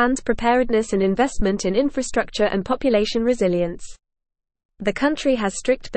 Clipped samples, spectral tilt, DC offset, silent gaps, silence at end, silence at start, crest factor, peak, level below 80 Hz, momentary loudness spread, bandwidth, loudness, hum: under 0.1%; -5 dB/octave; under 0.1%; 4.65-4.69 s; 0 s; 0 s; 16 dB; -6 dBFS; -38 dBFS; 5 LU; 8.8 kHz; -21 LUFS; none